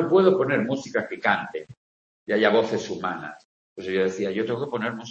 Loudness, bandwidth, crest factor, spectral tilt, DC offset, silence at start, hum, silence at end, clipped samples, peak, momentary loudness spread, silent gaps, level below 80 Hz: -24 LUFS; 7.8 kHz; 20 dB; -6 dB/octave; under 0.1%; 0 s; none; 0 s; under 0.1%; -4 dBFS; 15 LU; 1.77-2.26 s, 3.45-3.76 s; -68 dBFS